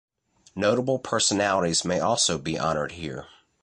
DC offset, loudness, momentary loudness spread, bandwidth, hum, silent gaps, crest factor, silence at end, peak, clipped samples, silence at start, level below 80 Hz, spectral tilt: under 0.1%; -24 LUFS; 14 LU; 11.5 kHz; none; none; 18 dB; 0.35 s; -8 dBFS; under 0.1%; 0.55 s; -54 dBFS; -3 dB/octave